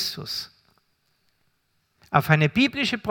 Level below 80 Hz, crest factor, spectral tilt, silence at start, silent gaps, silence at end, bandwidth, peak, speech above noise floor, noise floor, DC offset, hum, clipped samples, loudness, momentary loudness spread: -60 dBFS; 26 dB; -5.5 dB/octave; 0 s; none; 0 s; 18 kHz; 0 dBFS; 48 dB; -70 dBFS; under 0.1%; none; under 0.1%; -22 LUFS; 12 LU